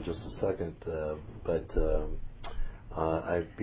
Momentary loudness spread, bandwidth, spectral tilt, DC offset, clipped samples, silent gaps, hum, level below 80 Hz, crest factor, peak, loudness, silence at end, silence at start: 12 LU; 4 kHz; -11 dB/octave; under 0.1%; under 0.1%; none; none; -40 dBFS; 18 dB; -14 dBFS; -35 LUFS; 0 s; 0 s